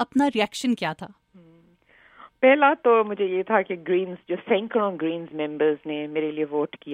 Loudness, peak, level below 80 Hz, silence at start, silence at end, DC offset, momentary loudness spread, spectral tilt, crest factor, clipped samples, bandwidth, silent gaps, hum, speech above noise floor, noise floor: -23 LUFS; -4 dBFS; -70 dBFS; 0 s; 0 s; under 0.1%; 12 LU; -5 dB/octave; 20 dB; under 0.1%; 13.5 kHz; none; none; 34 dB; -57 dBFS